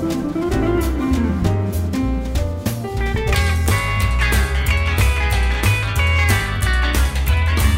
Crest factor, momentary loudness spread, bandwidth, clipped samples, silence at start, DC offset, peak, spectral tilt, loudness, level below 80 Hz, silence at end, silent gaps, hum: 16 dB; 5 LU; 16.5 kHz; under 0.1%; 0 s; under 0.1%; 0 dBFS; -5.5 dB/octave; -18 LUFS; -20 dBFS; 0 s; none; none